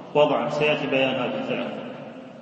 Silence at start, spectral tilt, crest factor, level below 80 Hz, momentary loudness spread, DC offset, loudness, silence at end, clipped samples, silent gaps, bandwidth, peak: 0 s; -6 dB/octave; 18 dB; -66 dBFS; 16 LU; under 0.1%; -23 LUFS; 0 s; under 0.1%; none; 8 kHz; -6 dBFS